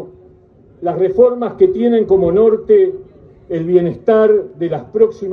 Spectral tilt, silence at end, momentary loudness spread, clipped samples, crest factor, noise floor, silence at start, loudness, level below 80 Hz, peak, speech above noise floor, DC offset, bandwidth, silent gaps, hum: -9.5 dB/octave; 0 s; 11 LU; under 0.1%; 14 dB; -46 dBFS; 0 s; -14 LUFS; -48 dBFS; 0 dBFS; 33 dB; under 0.1%; 4.1 kHz; none; none